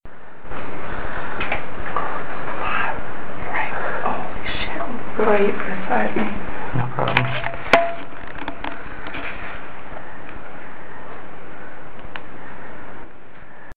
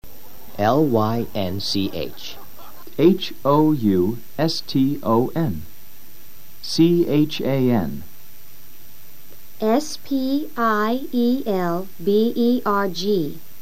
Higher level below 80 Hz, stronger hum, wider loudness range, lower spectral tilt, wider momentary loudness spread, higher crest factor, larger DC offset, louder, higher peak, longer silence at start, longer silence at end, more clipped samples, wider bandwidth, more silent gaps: first, -40 dBFS vs -54 dBFS; neither; first, 16 LU vs 4 LU; about the same, -6.5 dB/octave vs -6.5 dB/octave; first, 19 LU vs 13 LU; first, 24 dB vs 18 dB; first, 9% vs 4%; second, -24 LUFS vs -21 LUFS; first, 0 dBFS vs -4 dBFS; about the same, 0 s vs 0 s; second, 0 s vs 0.2 s; neither; second, 10.5 kHz vs 16.5 kHz; neither